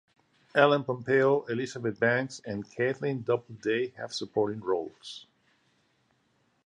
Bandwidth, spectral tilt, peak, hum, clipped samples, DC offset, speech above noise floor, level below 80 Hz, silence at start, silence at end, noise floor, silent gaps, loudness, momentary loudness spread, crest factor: 10 kHz; -5.5 dB/octave; -6 dBFS; none; under 0.1%; under 0.1%; 43 dB; -72 dBFS; 0.55 s; 1.45 s; -71 dBFS; none; -29 LUFS; 13 LU; 24 dB